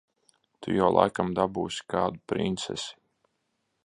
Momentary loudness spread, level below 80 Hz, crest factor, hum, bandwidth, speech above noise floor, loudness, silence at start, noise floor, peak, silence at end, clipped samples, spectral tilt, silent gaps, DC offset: 12 LU; -58 dBFS; 24 dB; none; 11 kHz; 50 dB; -27 LUFS; 0.6 s; -77 dBFS; -4 dBFS; 0.9 s; under 0.1%; -5.5 dB/octave; none; under 0.1%